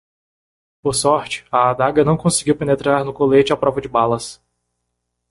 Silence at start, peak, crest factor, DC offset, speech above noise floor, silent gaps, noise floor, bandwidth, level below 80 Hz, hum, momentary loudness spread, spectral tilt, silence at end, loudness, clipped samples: 0.85 s; -2 dBFS; 16 dB; under 0.1%; 58 dB; none; -75 dBFS; 11.5 kHz; -48 dBFS; 60 Hz at -40 dBFS; 6 LU; -5 dB/octave; 0.95 s; -17 LUFS; under 0.1%